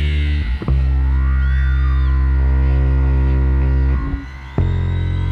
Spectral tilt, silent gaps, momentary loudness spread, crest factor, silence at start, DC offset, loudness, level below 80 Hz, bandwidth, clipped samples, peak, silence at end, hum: -9 dB/octave; none; 5 LU; 10 dB; 0 s; under 0.1%; -18 LUFS; -16 dBFS; 4.5 kHz; under 0.1%; -4 dBFS; 0 s; none